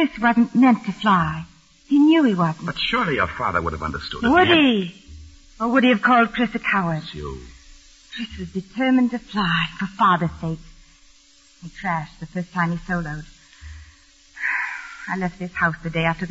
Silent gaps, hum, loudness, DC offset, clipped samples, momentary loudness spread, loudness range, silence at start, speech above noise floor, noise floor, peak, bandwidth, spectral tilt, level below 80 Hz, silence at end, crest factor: none; none; -20 LUFS; under 0.1%; under 0.1%; 16 LU; 9 LU; 0 s; 33 dB; -53 dBFS; -4 dBFS; 8 kHz; -6.5 dB/octave; -44 dBFS; 0 s; 18 dB